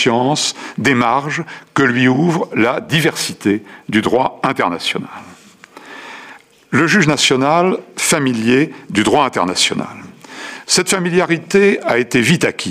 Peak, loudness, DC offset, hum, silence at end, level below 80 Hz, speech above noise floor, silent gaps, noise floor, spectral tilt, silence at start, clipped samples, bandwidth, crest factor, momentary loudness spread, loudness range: -2 dBFS; -15 LUFS; under 0.1%; none; 0 s; -54 dBFS; 26 dB; none; -41 dBFS; -4 dB/octave; 0 s; under 0.1%; 15.5 kHz; 14 dB; 17 LU; 4 LU